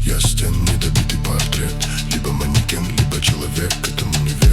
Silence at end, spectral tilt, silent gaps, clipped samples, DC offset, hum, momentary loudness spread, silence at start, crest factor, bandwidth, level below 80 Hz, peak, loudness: 0 s; -4 dB/octave; none; under 0.1%; under 0.1%; none; 4 LU; 0 s; 14 dB; 17.5 kHz; -22 dBFS; -4 dBFS; -18 LUFS